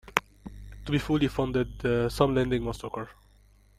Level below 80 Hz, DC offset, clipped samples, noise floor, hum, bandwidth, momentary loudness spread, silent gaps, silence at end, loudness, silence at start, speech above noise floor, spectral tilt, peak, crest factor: -44 dBFS; under 0.1%; under 0.1%; -59 dBFS; 50 Hz at -40 dBFS; 16 kHz; 19 LU; none; 0.65 s; -28 LUFS; 0.05 s; 31 dB; -6.5 dB/octave; 0 dBFS; 28 dB